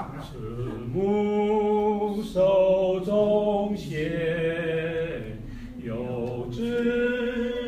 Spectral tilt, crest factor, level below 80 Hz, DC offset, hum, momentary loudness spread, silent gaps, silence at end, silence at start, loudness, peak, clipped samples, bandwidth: -7.5 dB/octave; 14 dB; -46 dBFS; under 0.1%; none; 13 LU; none; 0 s; 0 s; -25 LUFS; -10 dBFS; under 0.1%; 14.5 kHz